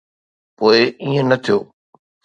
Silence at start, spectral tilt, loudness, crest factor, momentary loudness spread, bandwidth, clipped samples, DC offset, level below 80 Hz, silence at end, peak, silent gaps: 0.6 s; -6 dB/octave; -16 LUFS; 18 dB; 6 LU; 9 kHz; under 0.1%; under 0.1%; -62 dBFS; 0.6 s; 0 dBFS; none